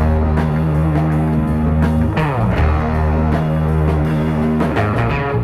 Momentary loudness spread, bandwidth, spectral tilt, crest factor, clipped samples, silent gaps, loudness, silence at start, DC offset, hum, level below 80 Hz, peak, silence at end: 1 LU; 11.5 kHz; -9 dB/octave; 12 dB; under 0.1%; none; -16 LUFS; 0 s; under 0.1%; none; -22 dBFS; -4 dBFS; 0 s